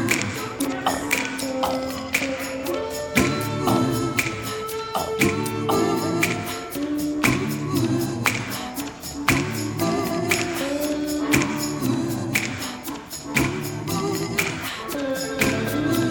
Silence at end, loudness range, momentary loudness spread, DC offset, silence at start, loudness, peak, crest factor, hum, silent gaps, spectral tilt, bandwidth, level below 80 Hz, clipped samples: 0 s; 2 LU; 7 LU; under 0.1%; 0 s; -24 LUFS; -2 dBFS; 22 dB; none; none; -4.5 dB/octave; over 20 kHz; -48 dBFS; under 0.1%